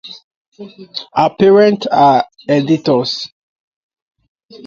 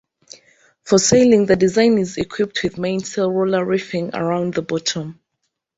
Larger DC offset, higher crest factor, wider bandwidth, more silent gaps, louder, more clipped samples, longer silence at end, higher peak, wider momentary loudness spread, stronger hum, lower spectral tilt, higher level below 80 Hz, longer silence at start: neither; about the same, 14 dB vs 16 dB; about the same, 7.4 kHz vs 8 kHz; first, 0.24-0.52 s vs none; first, -13 LUFS vs -18 LUFS; neither; first, 1.4 s vs 0.65 s; about the same, 0 dBFS vs -2 dBFS; first, 18 LU vs 10 LU; neither; first, -6.5 dB/octave vs -4.5 dB/octave; second, -58 dBFS vs -52 dBFS; second, 0.05 s vs 0.85 s